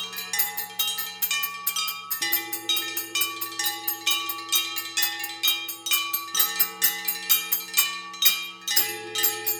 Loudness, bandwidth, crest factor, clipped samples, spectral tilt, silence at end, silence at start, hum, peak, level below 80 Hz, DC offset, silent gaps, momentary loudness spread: -23 LUFS; over 20 kHz; 24 dB; under 0.1%; 1.5 dB/octave; 0 s; 0 s; none; -4 dBFS; -80 dBFS; under 0.1%; none; 6 LU